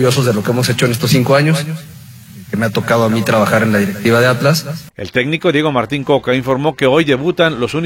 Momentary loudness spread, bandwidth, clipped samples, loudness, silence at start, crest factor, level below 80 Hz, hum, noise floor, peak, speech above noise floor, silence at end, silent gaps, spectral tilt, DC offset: 6 LU; 16.5 kHz; under 0.1%; -14 LUFS; 0 s; 14 dB; -48 dBFS; none; -35 dBFS; 0 dBFS; 22 dB; 0 s; none; -5.5 dB/octave; under 0.1%